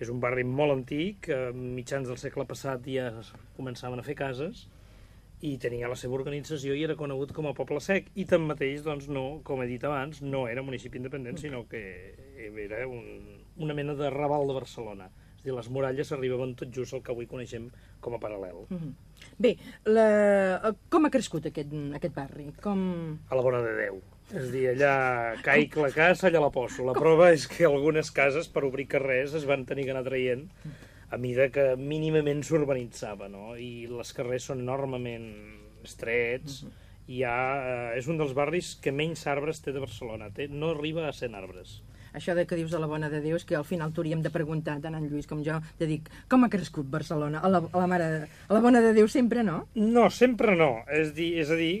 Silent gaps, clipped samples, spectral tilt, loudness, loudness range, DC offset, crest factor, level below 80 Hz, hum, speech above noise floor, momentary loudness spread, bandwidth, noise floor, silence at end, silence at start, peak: none; under 0.1%; -6 dB/octave; -28 LUFS; 12 LU; under 0.1%; 20 dB; -56 dBFS; none; 24 dB; 17 LU; 14.5 kHz; -52 dBFS; 0 s; 0 s; -8 dBFS